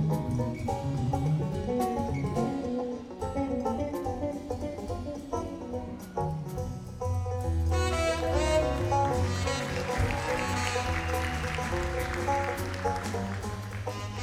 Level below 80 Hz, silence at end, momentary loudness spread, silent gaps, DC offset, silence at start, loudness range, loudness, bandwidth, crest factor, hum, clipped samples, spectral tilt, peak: -40 dBFS; 0 s; 9 LU; none; under 0.1%; 0 s; 6 LU; -31 LUFS; 15.5 kHz; 18 dB; none; under 0.1%; -6 dB/octave; -12 dBFS